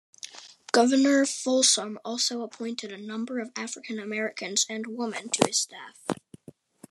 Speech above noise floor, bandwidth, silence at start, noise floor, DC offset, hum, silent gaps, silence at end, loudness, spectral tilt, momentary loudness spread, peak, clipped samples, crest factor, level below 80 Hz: 24 dB; 13 kHz; 0.25 s; -51 dBFS; under 0.1%; none; none; 0.75 s; -26 LUFS; -2 dB/octave; 15 LU; -2 dBFS; under 0.1%; 26 dB; -76 dBFS